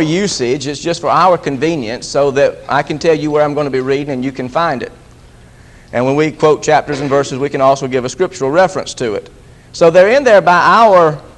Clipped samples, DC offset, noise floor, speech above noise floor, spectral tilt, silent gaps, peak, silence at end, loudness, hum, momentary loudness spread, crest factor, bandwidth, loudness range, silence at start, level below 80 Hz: 0.1%; under 0.1%; -40 dBFS; 28 dB; -5 dB/octave; none; 0 dBFS; 0.05 s; -12 LUFS; none; 12 LU; 12 dB; 11 kHz; 5 LU; 0 s; -44 dBFS